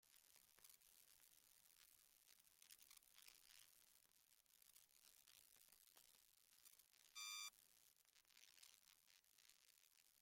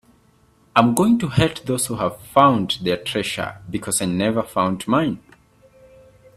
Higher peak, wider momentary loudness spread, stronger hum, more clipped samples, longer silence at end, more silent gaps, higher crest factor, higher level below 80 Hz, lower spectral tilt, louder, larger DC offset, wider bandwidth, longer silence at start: second, -42 dBFS vs 0 dBFS; first, 16 LU vs 10 LU; neither; neither; second, 0 s vs 1.2 s; neither; first, 28 dB vs 20 dB; second, under -90 dBFS vs -50 dBFS; second, 2.5 dB/octave vs -5 dB/octave; second, -61 LUFS vs -20 LUFS; neither; about the same, 16.5 kHz vs 15 kHz; second, 0 s vs 0.75 s